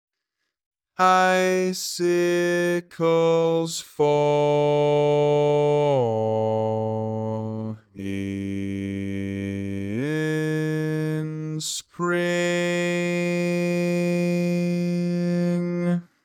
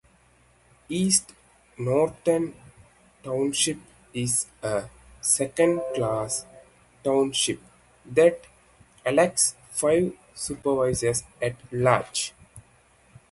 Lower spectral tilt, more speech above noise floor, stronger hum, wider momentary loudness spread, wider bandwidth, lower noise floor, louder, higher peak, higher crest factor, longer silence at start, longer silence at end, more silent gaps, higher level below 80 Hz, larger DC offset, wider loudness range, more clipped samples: first, -6 dB/octave vs -3.5 dB/octave; first, 59 dB vs 36 dB; neither; second, 9 LU vs 12 LU; first, 15 kHz vs 12 kHz; first, -81 dBFS vs -60 dBFS; about the same, -23 LUFS vs -25 LUFS; about the same, -6 dBFS vs -6 dBFS; second, 16 dB vs 22 dB; about the same, 1 s vs 0.9 s; second, 0.2 s vs 0.7 s; neither; second, -70 dBFS vs -56 dBFS; neither; first, 7 LU vs 3 LU; neither